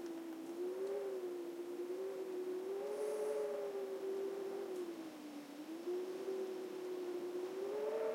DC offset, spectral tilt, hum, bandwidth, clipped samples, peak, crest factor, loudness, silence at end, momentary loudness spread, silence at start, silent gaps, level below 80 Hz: under 0.1%; -4.5 dB/octave; none; 16.5 kHz; under 0.1%; -30 dBFS; 12 dB; -44 LUFS; 0 s; 7 LU; 0 s; none; under -90 dBFS